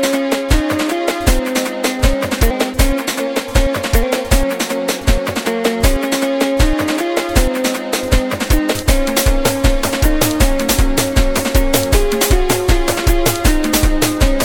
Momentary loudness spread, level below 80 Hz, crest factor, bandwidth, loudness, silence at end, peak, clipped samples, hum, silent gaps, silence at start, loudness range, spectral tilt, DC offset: 3 LU; -18 dBFS; 14 dB; 19 kHz; -16 LUFS; 0 s; 0 dBFS; under 0.1%; none; none; 0 s; 2 LU; -4.5 dB/octave; under 0.1%